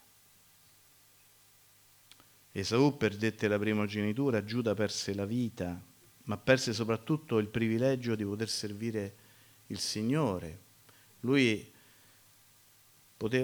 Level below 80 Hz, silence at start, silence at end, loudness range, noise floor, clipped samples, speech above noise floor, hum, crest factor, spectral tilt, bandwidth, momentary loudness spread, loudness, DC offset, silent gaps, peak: -66 dBFS; 2.55 s; 0 s; 4 LU; -63 dBFS; under 0.1%; 31 dB; none; 22 dB; -5.5 dB/octave; over 20 kHz; 12 LU; -32 LUFS; under 0.1%; none; -12 dBFS